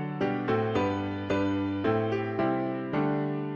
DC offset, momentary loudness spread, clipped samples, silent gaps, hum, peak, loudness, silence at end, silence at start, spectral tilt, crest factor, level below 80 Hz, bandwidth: under 0.1%; 3 LU; under 0.1%; none; none; -14 dBFS; -29 LUFS; 0 s; 0 s; -8 dB/octave; 14 dB; -58 dBFS; 7 kHz